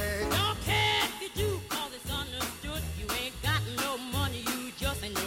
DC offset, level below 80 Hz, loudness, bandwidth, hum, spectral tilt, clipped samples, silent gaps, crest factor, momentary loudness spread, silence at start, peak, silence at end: under 0.1%; -44 dBFS; -31 LUFS; 16.5 kHz; none; -3.5 dB/octave; under 0.1%; none; 16 dB; 8 LU; 0 s; -16 dBFS; 0 s